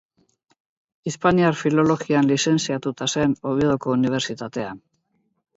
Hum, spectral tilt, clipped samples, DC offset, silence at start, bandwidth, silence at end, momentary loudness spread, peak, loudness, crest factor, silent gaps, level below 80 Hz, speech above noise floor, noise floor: none; -5 dB/octave; under 0.1%; under 0.1%; 1.05 s; 8 kHz; 0.8 s; 12 LU; -4 dBFS; -21 LUFS; 18 dB; none; -54 dBFS; 49 dB; -70 dBFS